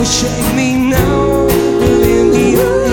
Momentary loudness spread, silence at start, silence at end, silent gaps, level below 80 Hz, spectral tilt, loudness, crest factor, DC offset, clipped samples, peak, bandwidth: 3 LU; 0 s; 0 s; none; -24 dBFS; -5 dB/octave; -11 LUFS; 10 dB; under 0.1%; under 0.1%; 0 dBFS; 19.5 kHz